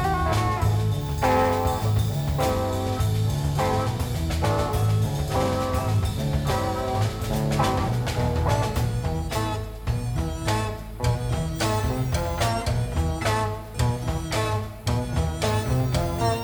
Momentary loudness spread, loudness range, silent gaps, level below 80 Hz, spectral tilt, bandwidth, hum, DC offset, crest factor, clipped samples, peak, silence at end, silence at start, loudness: 4 LU; 3 LU; none; -32 dBFS; -6 dB/octave; over 20 kHz; none; under 0.1%; 16 dB; under 0.1%; -8 dBFS; 0 s; 0 s; -25 LUFS